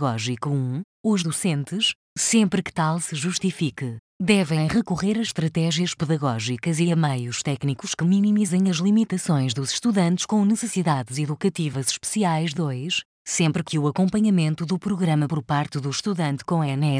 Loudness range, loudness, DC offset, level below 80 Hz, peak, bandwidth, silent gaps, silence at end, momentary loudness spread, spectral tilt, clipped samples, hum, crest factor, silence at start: 2 LU; -23 LUFS; under 0.1%; -58 dBFS; -6 dBFS; 10.5 kHz; 0.84-1.04 s, 1.95-2.16 s, 3.99-4.20 s, 13.05-13.25 s; 0 s; 6 LU; -5 dB/octave; under 0.1%; none; 16 dB; 0 s